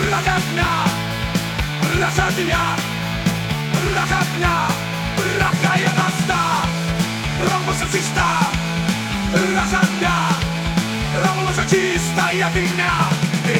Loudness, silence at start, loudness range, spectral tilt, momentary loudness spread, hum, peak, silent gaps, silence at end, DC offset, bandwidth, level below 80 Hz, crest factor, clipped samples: -18 LUFS; 0 s; 1 LU; -4.5 dB/octave; 4 LU; none; 0 dBFS; none; 0 s; under 0.1%; 18 kHz; -34 dBFS; 18 dB; under 0.1%